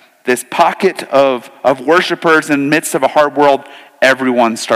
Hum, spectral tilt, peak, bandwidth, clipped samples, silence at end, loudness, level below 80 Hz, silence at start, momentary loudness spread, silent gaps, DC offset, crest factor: none; -4 dB/octave; 0 dBFS; 16 kHz; under 0.1%; 0 s; -12 LUFS; -60 dBFS; 0.25 s; 5 LU; none; under 0.1%; 12 dB